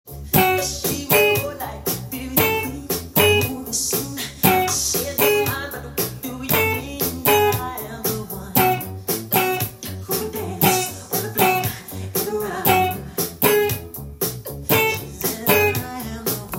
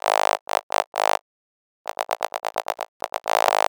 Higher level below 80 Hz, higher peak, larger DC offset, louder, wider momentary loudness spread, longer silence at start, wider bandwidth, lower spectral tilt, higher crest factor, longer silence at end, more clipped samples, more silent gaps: first, -46 dBFS vs -76 dBFS; about the same, 0 dBFS vs 0 dBFS; neither; first, -20 LUFS vs -25 LUFS; about the same, 10 LU vs 10 LU; about the same, 0.05 s vs 0.05 s; second, 17 kHz vs over 20 kHz; first, -3.5 dB/octave vs 1 dB/octave; about the same, 20 dB vs 24 dB; about the same, 0 s vs 0.1 s; neither; second, none vs 0.41-0.47 s, 0.63-0.70 s, 0.87-0.92 s, 1.21-1.85 s, 2.88-3.00 s